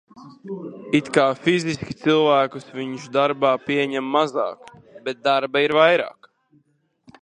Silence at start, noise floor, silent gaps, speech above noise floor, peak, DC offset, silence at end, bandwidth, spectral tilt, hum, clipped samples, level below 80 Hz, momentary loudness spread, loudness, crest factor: 0.15 s; -64 dBFS; none; 43 dB; 0 dBFS; under 0.1%; 1.1 s; 10.5 kHz; -5 dB/octave; none; under 0.1%; -62 dBFS; 16 LU; -20 LUFS; 20 dB